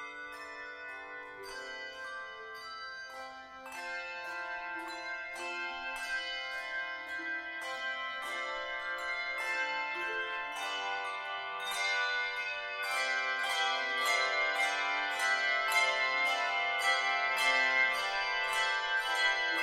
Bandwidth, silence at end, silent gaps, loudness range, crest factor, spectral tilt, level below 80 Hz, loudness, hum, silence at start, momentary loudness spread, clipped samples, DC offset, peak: 16 kHz; 0 s; none; 13 LU; 18 dB; 1 dB/octave; -70 dBFS; -32 LUFS; none; 0 s; 15 LU; under 0.1%; under 0.1%; -16 dBFS